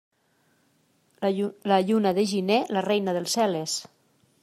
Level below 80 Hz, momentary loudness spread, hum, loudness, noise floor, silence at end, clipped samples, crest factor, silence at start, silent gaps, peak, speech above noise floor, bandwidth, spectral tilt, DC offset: -74 dBFS; 7 LU; none; -25 LUFS; -67 dBFS; 0.6 s; under 0.1%; 18 dB; 1.2 s; none; -8 dBFS; 43 dB; 14.5 kHz; -4.5 dB/octave; under 0.1%